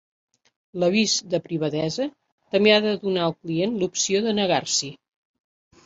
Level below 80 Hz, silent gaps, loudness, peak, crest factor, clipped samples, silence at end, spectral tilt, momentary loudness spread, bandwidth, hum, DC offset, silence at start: -64 dBFS; 2.32-2.38 s; -22 LUFS; -2 dBFS; 22 dB; under 0.1%; 0.9 s; -3.5 dB/octave; 9 LU; 8 kHz; none; under 0.1%; 0.75 s